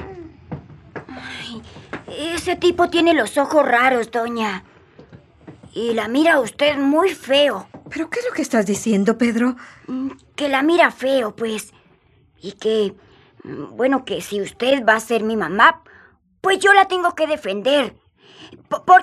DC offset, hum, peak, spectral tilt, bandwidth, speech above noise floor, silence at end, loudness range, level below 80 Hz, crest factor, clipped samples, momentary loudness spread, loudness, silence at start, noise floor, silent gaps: under 0.1%; none; 0 dBFS; -4 dB/octave; 14.5 kHz; 38 dB; 0 s; 5 LU; -58 dBFS; 18 dB; under 0.1%; 20 LU; -18 LUFS; 0 s; -56 dBFS; none